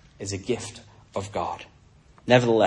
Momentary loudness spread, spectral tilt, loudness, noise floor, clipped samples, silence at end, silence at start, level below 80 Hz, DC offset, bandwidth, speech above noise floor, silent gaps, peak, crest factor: 19 LU; -5 dB/octave; -26 LUFS; -54 dBFS; under 0.1%; 0 s; 0.2 s; -58 dBFS; under 0.1%; 11 kHz; 31 dB; none; -4 dBFS; 22 dB